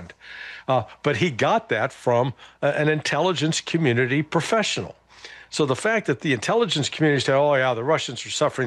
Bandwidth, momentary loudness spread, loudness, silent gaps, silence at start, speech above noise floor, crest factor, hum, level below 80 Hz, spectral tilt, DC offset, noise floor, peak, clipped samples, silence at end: 12 kHz; 9 LU; -22 LUFS; none; 0 s; 22 dB; 14 dB; none; -64 dBFS; -4.5 dB/octave; under 0.1%; -45 dBFS; -10 dBFS; under 0.1%; 0 s